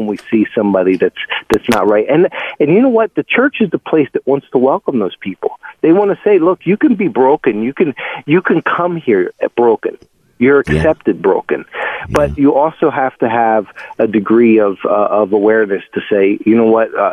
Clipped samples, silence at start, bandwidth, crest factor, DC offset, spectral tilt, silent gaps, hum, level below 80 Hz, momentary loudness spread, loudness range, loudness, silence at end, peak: under 0.1%; 0 s; 13 kHz; 12 dB; under 0.1%; -7 dB/octave; none; none; -40 dBFS; 7 LU; 2 LU; -13 LUFS; 0 s; 0 dBFS